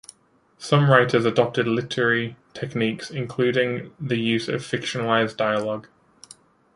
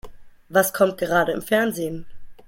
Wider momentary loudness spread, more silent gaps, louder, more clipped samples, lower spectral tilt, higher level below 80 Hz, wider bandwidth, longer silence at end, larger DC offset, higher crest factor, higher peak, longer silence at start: first, 14 LU vs 11 LU; neither; about the same, -22 LUFS vs -21 LUFS; neither; first, -6 dB/octave vs -4.5 dB/octave; second, -62 dBFS vs -50 dBFS; second, 11.5 kHz vs 16.5 kHz; first, 0.95 s vs 0.05 s; neither; about the same, 22 dB vs 18 dB; about the same, -2 dBFS vs -4 dBFS; first, 0.6 s vs 0.05 s